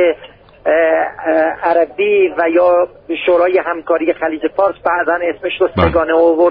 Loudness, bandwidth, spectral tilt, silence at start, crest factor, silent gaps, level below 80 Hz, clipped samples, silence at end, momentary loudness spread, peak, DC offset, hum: -14 LUFS; 5 kHz; -4 dB/octave; 0 s; 14 dB; none; -40 dBFS; under 0.1%; 0 s; 6 LU; 0 dBFS; under 0.1%; none